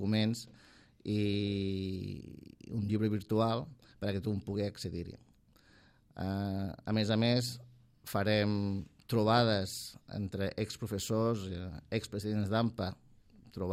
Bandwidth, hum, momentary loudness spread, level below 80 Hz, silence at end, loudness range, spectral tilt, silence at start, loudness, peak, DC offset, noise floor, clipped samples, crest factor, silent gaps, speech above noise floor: 15.5 kHz; none; 14 LU; -64 dBFS; 0 s; 5 LU; -6 dB/octave; 0 s; -34 LUFS; -14 dBFS; under 0.1%; -64 dBFS; under 0.1%; 20 dB; none; 31 dB